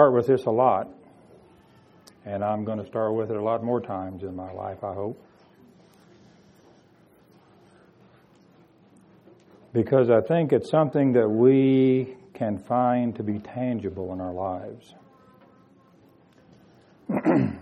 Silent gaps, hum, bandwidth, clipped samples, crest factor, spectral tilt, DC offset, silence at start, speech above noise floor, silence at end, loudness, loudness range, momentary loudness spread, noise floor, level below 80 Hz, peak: none; none; 8.8 kHz; under 0.1%; 22 dB; -9.5 dB/octave; under 0.1%; 0 s; 34 dB; 0 s; -24 LUFS; 16 LU; 16 LU; -57 dBFS; -66 dBFS; -4 dBFS